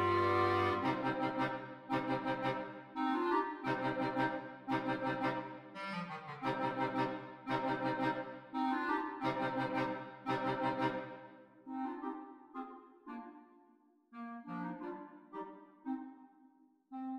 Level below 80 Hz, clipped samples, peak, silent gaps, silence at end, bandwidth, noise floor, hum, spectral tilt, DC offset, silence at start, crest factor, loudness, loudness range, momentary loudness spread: -74 dBFS; under 0.1%; -20 dBFS; none; 0 s; 12 kHz; -69 dBFS; none; -7 dB/octave; under 0.1%; 0 s; 18 dB; -38 LUFS; 11 LU; 16 LU